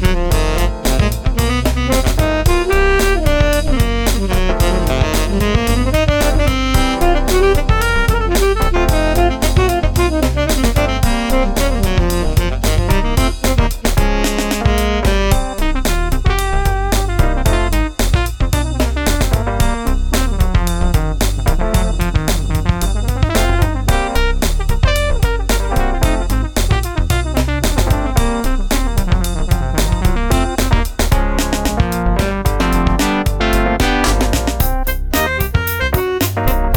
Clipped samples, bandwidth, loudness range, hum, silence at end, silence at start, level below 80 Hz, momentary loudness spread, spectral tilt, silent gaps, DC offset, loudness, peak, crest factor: under 0.1%; over 20 kHz; 2 LU; none; 0 s; 0 s; -16 dBFS; 3 LU; -5 dB/octave; none; under 0.1%; -16 LUFS; 0 dBFS; 14 dB